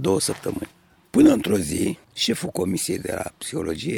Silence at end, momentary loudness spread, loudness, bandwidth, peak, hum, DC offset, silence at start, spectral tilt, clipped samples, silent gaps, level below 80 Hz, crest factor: 0 s; 13 LU; -23 LUFS; 18.5 kHz; -4 dBFS; none; under 0.1%; 0 s; -4.5 dB/octave; under 0.1%; none; -50 dBFS; 20 dB